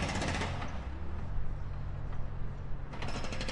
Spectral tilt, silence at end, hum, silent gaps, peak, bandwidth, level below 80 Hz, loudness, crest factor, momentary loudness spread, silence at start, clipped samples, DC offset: -5 dB/octave; 0 s; none; none; -20 dBFS; 11 kHz; -40 dBFS; -39 LUFS; 14 dB; 9 LU; 0 s; under 0.1%; under 0.1%